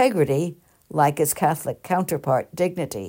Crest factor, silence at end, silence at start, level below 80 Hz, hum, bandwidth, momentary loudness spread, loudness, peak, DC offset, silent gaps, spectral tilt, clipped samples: 16 dB; 0 s; 0 s; -60 dBFS; none; 16.5 kHz; 7 LU; -23 LUFS; -6 dBFS; under 0.1%; none; -5.5 dB/octave; under 0.1%